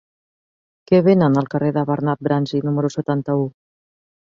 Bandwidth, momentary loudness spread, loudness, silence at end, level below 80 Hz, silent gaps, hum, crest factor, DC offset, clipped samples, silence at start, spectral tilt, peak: 7.6 kHz; 8 LU; -19 LUFS; 0.75 s; -58 dBFS; none; none; 16 dB; under 0.1%; under 0.1%; 0.9 s; -8.5 dB/octave; -2 dBFS